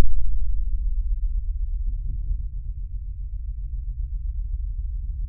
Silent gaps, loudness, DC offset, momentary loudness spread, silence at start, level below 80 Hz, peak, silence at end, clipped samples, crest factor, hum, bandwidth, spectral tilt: none; -32 LUFS; under 0.1%; 6 LU; 0 s; -26 dBFS; -4 dBFS; 0 s; under 0.1%; 16 dB; none; 0.3 kHz; -17.5 dB/octave